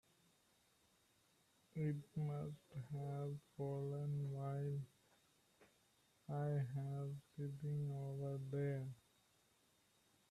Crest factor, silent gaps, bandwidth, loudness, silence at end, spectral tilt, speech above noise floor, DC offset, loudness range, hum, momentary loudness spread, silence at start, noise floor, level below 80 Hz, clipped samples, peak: 14 dB; none; 12 kHz; -46 LUFS; 1.35 s; -9 dB/octave; 33 dB; under 0.1%; 3 LU; none; 8 LU; 1.75 s; -77 dBFS; -80 dBFS; under 0.1%; -32 dBFS